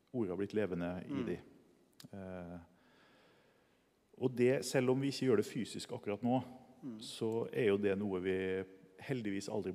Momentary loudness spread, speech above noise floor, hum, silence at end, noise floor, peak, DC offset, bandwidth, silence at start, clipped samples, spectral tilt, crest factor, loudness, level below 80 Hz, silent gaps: 17 LU; 37 dB; none; 0 s; -73 dBFS; -20 dBFS; under 0.1%; 15.5 kHz; 0.15 s; under 0.1%; -6 dB/octave; 18 dB; -37 LUFS; -76 dBFS; none